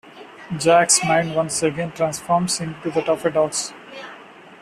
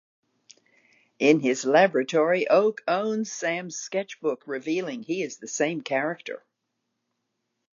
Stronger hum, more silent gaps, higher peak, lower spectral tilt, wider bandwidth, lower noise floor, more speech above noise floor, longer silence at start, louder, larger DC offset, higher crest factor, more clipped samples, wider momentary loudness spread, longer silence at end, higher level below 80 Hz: neither; neither; first, -2 dBFS vs -6 dBFS; about the same, -3.5 dB/octave vs -4 dB/octave; first, 14 kHz vs 7.6 kHz; second, -43 dBFS vs -80 dBFS; second, 23 dB vs 55 dB; second, 0.05 s vs 1.2 s; first, -19 LUFS vs -25 LUFS; neither; about the same, 18 dB vs 20 dB; neither; first, 21 LU vs 11 LU; second, 0.05 s vs 1.35 s; first, -58 dBFS vs -84 dBFS